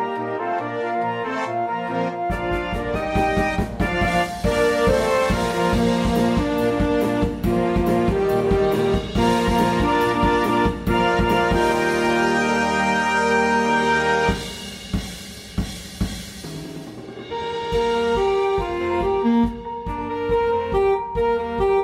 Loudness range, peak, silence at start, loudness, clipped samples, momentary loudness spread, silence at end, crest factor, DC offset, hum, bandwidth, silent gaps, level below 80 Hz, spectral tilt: 5 LU; -6 dBFS; 0 s; -21 LUFS; under 0.1%; 10 LU; 0 s; 14 dB; under 0.1%; none; 16 kHz; none; -34 dBFS; -5.5 dB/octave